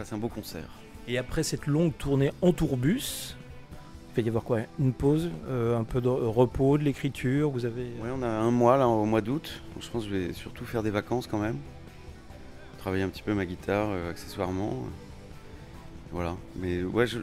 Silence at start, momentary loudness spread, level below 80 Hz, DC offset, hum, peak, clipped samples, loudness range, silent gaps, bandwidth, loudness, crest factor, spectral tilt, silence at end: 0 s; 22 LU; -46 dBFS; under 0.1%; none; -8 dBFS; under 0.1%; 7 LU; none; 16 kHz; -29 LUFS; 20 dB; -6.5 dB/octave; 0 s